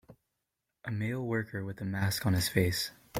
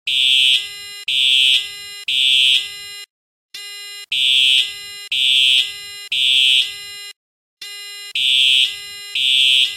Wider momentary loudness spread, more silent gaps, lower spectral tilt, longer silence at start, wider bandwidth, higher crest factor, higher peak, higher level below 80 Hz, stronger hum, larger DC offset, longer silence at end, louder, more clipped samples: second, 10 LU vs 20 LU; second, none vs 3.10-3.49 s, 7.16-7.57 s; first, -5 dB/octave vs 3.5 dB/octave; about the same, 0.1 s vs 0.05 s; about the same, 16.5 kHz vs 17 kHz; first, 22 dB vs 14 dB; second, -10 dBFS vs -4 dBFS; first, -58 dBFS vs -68 dBFS; neither; neither; about the same, 0 s vs 0 s; second, -32 LUFS vs -13 LUFS; neither